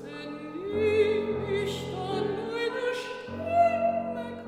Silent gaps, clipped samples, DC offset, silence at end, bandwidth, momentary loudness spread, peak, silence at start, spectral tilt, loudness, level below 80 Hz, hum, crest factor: none; under 0.1%; under 0.1%; 0 s; 14 kHz; 13 LU; -12 dBFS; 0 s; -5.5 dB/octave; -29 LUFS; -60 dBFS; none; 16 dB